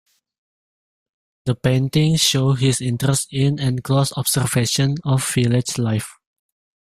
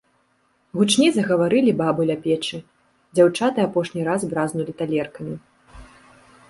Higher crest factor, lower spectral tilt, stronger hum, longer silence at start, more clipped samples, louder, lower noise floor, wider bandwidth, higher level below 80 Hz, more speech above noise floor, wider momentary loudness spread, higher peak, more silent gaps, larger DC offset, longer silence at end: about the same, 18 dB vs 18 dB; about the same, -4.5 dB/octave vs -5 dB/octave; neither; first, 1.45 s vs 0.75 s; neither; about the same, -19 LUFS vs -21 LUFS; first, under -90 dBFS vs -64 dBFS; first, 15 kHz vs 11.5 kHz; first, -50 dBFS vs -56 dBFS; first, over 72 dB vs 44 dB; second, 7 LU vs 14 LU; about the same, -2 dBFS vs -4 dBFS; neither; neither; about the same, 0.75 s vs 0.65 s